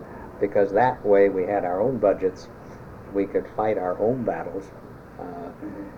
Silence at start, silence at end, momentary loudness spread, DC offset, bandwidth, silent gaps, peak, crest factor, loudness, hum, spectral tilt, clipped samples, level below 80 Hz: 0 s; 0 s; 22 LU; under 0.1%; 7 kHz; none; -6 dBFS; 18 dB; -23 LUFS; none; -8 dB/octave; under 0.1%; -52 dBFS